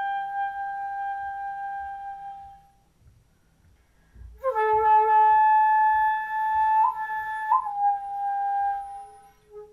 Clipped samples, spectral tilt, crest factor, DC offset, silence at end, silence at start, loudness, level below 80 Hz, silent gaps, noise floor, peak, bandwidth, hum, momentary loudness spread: under 0.1%; -4 dB/octave; 14 dB; under 0.1%; 0.05 s; 0 s; -24 LUFS; -58 dBFS; none; -61 dBFS; -10 dBFS; 11 kHz; none; 17 LU